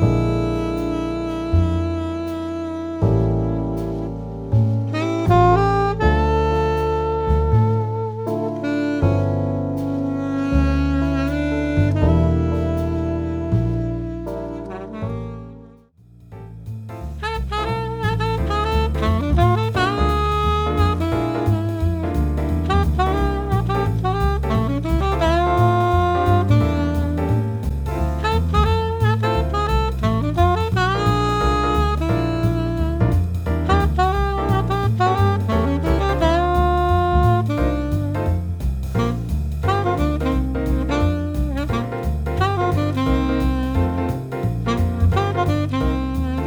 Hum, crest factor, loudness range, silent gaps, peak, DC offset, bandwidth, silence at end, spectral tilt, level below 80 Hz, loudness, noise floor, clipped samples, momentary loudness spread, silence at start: none; 16 dB; 4 LU; none; -2 dBFS; under 0.1%; 18.5 kHz; 0 s; -7.5 dB/octave; -26 dBFS; -20 LUFS; -48 dBFS; under 0.1%; 7 LU; 0 s